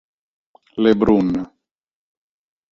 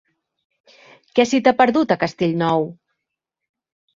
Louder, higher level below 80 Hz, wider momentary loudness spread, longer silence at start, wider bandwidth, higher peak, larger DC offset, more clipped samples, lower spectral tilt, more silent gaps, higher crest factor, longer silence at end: about the same, -17 LUFS vs -18 LUFS; first, -46 dBFS vs -62 dBFS; first, 18 LU vs 7 LU; second, 0.75 s vs 1.15 s; second, 7 kHz vs 7.8 kHz; about the same, -2 dBFS vs -2 dBFS; neither; neither; first, -8.5 dB/octave vs -5.5 dB/octave; neither; about the same, 18 dB vs 20 dB; about the same, 1.25 s vs 1.25 s